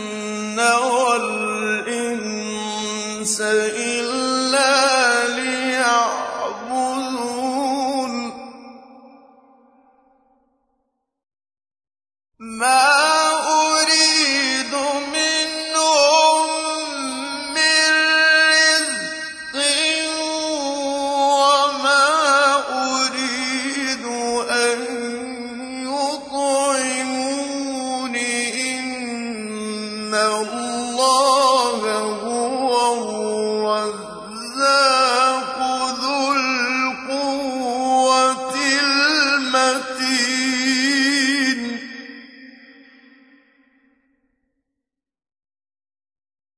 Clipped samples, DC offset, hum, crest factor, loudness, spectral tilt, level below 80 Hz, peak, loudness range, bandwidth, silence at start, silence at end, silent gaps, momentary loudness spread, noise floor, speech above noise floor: under 0.1%; under 0.1%; none; 16 dB; -18 LUFS; -1 dB/octave; -64 dBFS; -4 dBFS; 7 LU; 11 kHz; 0 s; 3.85 s; none; 12 LU; -83 dBFS; 64 dB